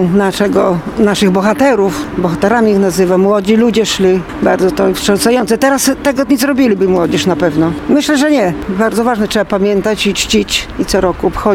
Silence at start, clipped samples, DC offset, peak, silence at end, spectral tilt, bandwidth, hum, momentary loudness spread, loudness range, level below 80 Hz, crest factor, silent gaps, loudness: 0 s; under 0.1%; under 0.1%; 0 dBFS; 0 s; -5 dB/octave; 17 kHz; none; 4 LU; 1 LU; -34 dBFS; 12 dB; none; -12 LUFS